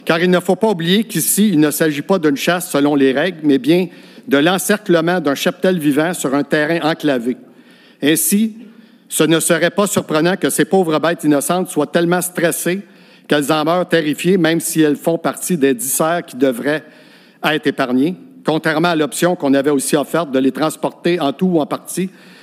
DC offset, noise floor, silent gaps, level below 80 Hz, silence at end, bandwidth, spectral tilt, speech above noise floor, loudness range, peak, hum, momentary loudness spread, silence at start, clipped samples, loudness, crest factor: under 0.1%; -45 dBFS; none; -72 dBFS; 0.35 s; 16 kHz; -4.5 dB/octave; 30 dB; 3 LU; 0 dBFS; none; 6 LU; 0.05 s; under 0.1%; -16 LUFS; 16 dB